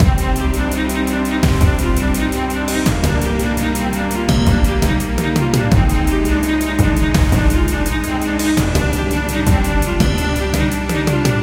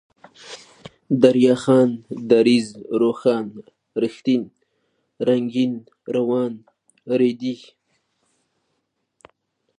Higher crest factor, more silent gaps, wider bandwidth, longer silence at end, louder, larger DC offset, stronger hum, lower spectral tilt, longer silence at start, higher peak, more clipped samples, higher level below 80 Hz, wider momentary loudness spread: second, 14 dB vs 22 dB; neither; first, 17 kHz vs 10 kHz; second, 0 s vs 2.25 s; first, -17 LUFS vs -20 LUFS; neither; neither; about the same, -5.5 dB/octave vs -6.5 dB/octave; second, 0 s vs 0.45 s; about the same, 0 dBFS vs 0 dBFS; neither; first, -20 dBFS vs -70 dBFS; second, 4 LU vs 20 LU